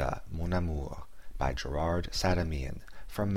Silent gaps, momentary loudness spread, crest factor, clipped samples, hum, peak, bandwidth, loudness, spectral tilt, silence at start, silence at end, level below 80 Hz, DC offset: none; 13 LU; 18 dB; under 0.1%; none; -14 dBFS; 16 kHz; -34 LUFS; -6 dB/octave; 0 s; 0 s; -38 dBFS; 0.8%